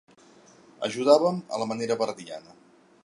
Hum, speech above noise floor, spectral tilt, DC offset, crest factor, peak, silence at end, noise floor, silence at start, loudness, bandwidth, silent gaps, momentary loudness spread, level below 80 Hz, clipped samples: none; 30 dB; -5 dB/octave; under 0.1%; 22 dB; -6 dBFS; 0.65 s; -55 dBFS; 0.8 s; -25 LUFS; 11.5 kHz; none; 19 LU; -76 dBFS; under 0.1%